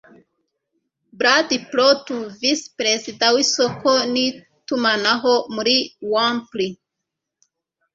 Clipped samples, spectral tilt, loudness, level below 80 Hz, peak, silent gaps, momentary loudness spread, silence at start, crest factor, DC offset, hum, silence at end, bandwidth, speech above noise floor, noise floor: under 0.1%; -2 dB/octave; -19 LUFS; -66 dBFS; -2 dBFS; none; 8 LU; 1.2 s; 20 dB; under 0.1%; none; 1.2 s; 7.8 kHz; 62 dB; -81 dBFS